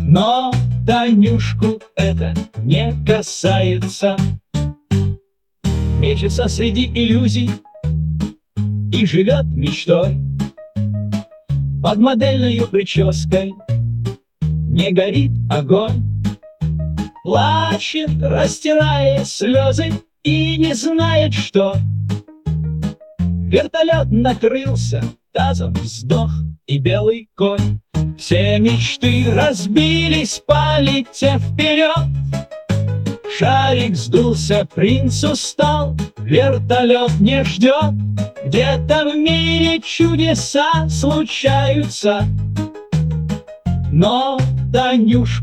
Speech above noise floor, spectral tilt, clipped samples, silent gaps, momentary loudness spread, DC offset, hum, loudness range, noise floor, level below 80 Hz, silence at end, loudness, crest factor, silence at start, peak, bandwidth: 29 dB; -6 dB/octave; under 0.1%; none; 9 LU; 0.1%; none; 3 LU; -44 dBFS; -32 dBFS; 0 s; -16 LUFS; 16 dB; 0 s; 0 dBFS; 11.5 kHz